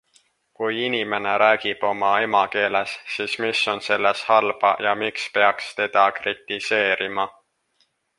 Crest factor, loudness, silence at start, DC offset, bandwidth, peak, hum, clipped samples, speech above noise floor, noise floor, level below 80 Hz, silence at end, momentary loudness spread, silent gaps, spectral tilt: 20 dB; -21 LUFS; 0.6 s; under 0.1%; 11.5 kHz; -2 dBFS; none; under 0.1%; 46 dB; -67 dBFS; -68 dBFS; 0.9 s; 8 LU; none; -3 dB/octave